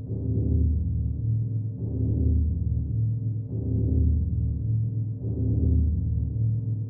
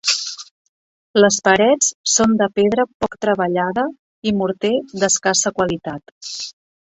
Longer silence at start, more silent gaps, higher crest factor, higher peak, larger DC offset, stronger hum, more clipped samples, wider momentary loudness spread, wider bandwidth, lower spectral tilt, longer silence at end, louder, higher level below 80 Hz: about the same, 0 s vs 0.05 s; second, none vs 0.51-1.14 s, 1.95-2.04 s, 2.94-3.00 s, 3.99-4.22 s, 6.12-6.21 s; second, 12 dB vs 18 dB; second, -12 dBFS vs -2 dBFS; neither; neither; neither; second, 6 LU vs 14 LU; second, 0.9 kHz vs 8.4 kHz; first, -19 dB/octave vs -3 dB/octave; second, 0 s vs 0.3 s; second, -27 LUFS vs -17 LUFS; first, -30 dBFS vs -54 dBFS